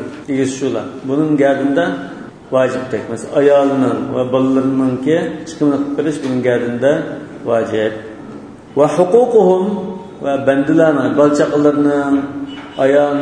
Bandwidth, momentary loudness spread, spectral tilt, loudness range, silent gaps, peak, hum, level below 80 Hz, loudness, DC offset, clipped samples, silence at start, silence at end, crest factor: 10 kHz; 13 LU; -6.5 dB/octave; 4 LU; none; 0 dBFS; none; -54 dBFS; -15 LUFS; under 0.1%; under 0.1%; 0 s; 0 s; 14 dB